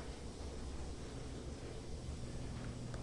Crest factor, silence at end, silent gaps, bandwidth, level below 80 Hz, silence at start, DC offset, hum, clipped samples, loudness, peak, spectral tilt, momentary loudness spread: 12 dB; 0 s; none; 11.5 kHz; -50 dBFS; 0 s; under 0.1%; none; under 0.1%; -48 LUFS; -32 dBFS; -5.5 dB/octave; 2 LU